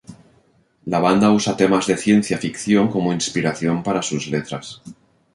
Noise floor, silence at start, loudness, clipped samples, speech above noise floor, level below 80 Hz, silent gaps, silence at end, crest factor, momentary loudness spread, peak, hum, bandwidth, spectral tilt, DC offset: -58 dBFS; 0.1 s; -19 LUFS; under 0.1%; 40 dB; -54 dBFS; none; 0.4 s; 18 dB; 14 LU; -2 dBFS; none; 11.5 kHz; -5 dB/octave; under 0.1%